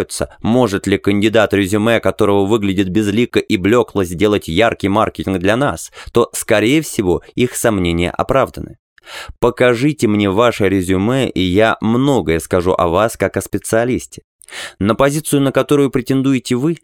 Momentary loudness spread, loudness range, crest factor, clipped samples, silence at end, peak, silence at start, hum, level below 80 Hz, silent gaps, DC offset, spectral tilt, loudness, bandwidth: 6 LU; 2 LU; 14 dB; under 0.1%; 0.05 s; 0 dBFS; 0 s; none; -40 dBFS; 8.79-8.96 s, 14.24-14.39 s; under 0.1%; -5.5 dB/octave; -15 LUFS; 18 kHz